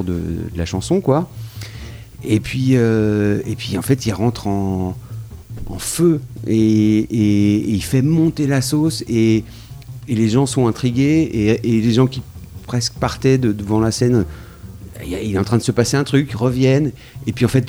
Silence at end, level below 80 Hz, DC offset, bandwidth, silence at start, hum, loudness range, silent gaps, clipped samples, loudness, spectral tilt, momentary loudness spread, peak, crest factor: 0 s; -38 dBFS; under 0.1%; over 20 kHz; 0 s; none; 3 LU; none; under 0.1%; -17 LUFS; -6.5 dB/octave; 17 LU; -2 dBFS; 16 dB